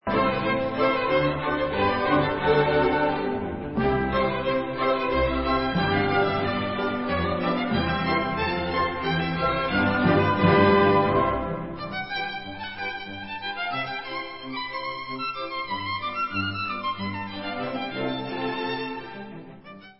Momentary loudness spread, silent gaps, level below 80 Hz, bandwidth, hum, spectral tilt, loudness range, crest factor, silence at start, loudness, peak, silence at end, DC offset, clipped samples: 11 LU; none; -44 dBFS; 5.8 kHz; none; -10.5 dB/octave; 9 LU; 18 dB; 0 s; -25 LUFS; -6 dBFS; 0.05 s; 0.3%; under 0.1%